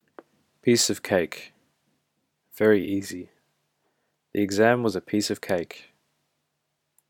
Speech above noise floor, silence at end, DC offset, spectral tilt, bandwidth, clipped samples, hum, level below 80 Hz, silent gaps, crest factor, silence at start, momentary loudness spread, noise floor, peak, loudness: 54 dB; 1.3 s; under 0.1%; -4 dB/octave; 18 kHz; under 0.1%; none; -68 dBFS; none; 22 dB; 0.65 s; 17 LU; -78 dBFS; -4 dBFS; -24 LUFS